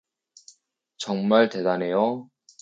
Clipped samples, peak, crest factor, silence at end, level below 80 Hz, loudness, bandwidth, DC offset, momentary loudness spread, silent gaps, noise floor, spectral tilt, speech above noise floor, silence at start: under 0.1%; -6 dBFS; 20 dB; 0.4 s; -76 dBFS; -23 LUFS; 9 kHz; under 0.1%; 14 LU; none; -62 dBFS; -5.5 dB/octave; 39 dB; 1 s